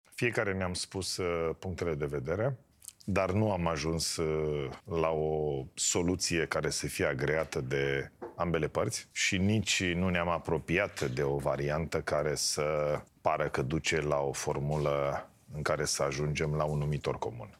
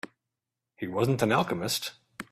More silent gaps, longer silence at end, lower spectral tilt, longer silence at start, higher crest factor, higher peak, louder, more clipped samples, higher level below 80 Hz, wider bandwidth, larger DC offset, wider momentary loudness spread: neither; about the same, 0.05 s vs 0.1 s; about the same, -4.5 dB/octave vs -4.5 dB/octave; second, 0.15 s vs 0.8 s; about the same, 20 dB vs 20 dB; about the same, -12 dBFS vs -10 dBFS; second, -32 LUFS vs -28 LUFS; neither; first, -54 dBFS vs -66 dBFS; about the same, 15.5 kHz vs 15.5 kHz; neither; second, 6 LU vs 17 LU